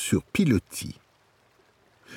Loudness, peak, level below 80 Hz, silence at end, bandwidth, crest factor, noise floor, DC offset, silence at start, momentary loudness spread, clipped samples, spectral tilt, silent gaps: -26 LUFS; -10 dBFS; -52 dBFS; 0 s; 18.5 kHz; 20 dB; -63 dBFS; under 0.1%; 0 s; 17 LU; under 0.1%; -5.5 dB/octave; none